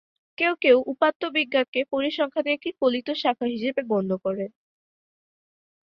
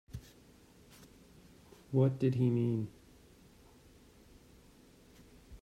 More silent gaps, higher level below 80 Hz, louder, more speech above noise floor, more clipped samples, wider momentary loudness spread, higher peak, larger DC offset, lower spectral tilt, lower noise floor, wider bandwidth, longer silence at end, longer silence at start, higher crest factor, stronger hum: first, 1.15-1.20 s, 1.68-1.73 s vs none; second, -70 dBFS vs -64 dBFS; first, -24 LUFS vs -33 LUFS; first, over 66 dB vs 30 dB; neither; second, 8 LU vs 27 LU; first, -6 dBFS vs -18 dBFS; neither; second, -7 dB/octave vs -9 dB/octave; first, under -90 dBFS vs -61 dBFS; second, 6 kHz vs 12.5 kHz; first, 1.45 s vs 0.05 s; first, 0.4 s vs 0.15 s; about the same, 20 dB vs 20 dB; neither